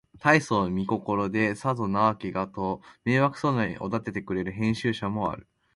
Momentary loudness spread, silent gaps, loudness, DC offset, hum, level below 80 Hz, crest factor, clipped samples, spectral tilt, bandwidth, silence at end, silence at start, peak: 9 LU; none; -27 LUFS; under 0.1%; none; -54 dBFS; 22 dB; under 0.1%; -6.5 dB/octave; 11.5 kHz; 0.35 s; 0.15 s; -4 dBFS